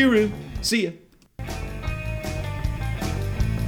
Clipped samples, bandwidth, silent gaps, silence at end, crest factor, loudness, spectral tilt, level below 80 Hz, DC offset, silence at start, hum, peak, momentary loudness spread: under 0.1%; 19 kHz; none; 0 s; 18 dB; -26 LUFS; -5.5 dB/octave; -32 dBFS; under 0.1%; 0 s; none; -6 dBFS; 11 LU